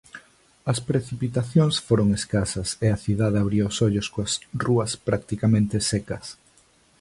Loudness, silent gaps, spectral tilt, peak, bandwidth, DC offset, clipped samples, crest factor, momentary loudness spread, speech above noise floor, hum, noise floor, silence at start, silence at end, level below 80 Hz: -24 LUFS; none; -5.5 dB/octave; -6 dBFS; 11.5 kHz; under 0.1%; under 0.1%; 18 dB; 7 LU; 36 dB; none; -59 dBFS; 0.15 s; 0.65 s; -46 dBFS